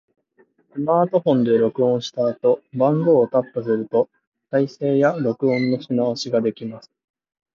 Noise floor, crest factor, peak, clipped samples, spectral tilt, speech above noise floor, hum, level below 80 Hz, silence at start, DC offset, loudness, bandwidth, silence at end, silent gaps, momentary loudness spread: -60 dBFS; 16 dB; -4 dBFS; under 0.1%; -7 dB/octave; 40 dB; none; -68 dBFS; 0.75 s; under 0.1%; -20 LUFS; 7.4 kHz; 0.75 s; 4.27-4.32 s; 7 LU